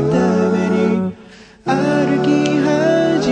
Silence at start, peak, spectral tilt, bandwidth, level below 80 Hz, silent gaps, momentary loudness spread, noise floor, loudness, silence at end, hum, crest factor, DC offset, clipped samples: 0 s; -4 dBFS; -6.5 dB/octave; 9.6 kHz; -48 dBFS; none; 6 LU; -41 dBFS; -16 LUFS; 0 s; none; 12 dB; under 0.1%; under 0.1%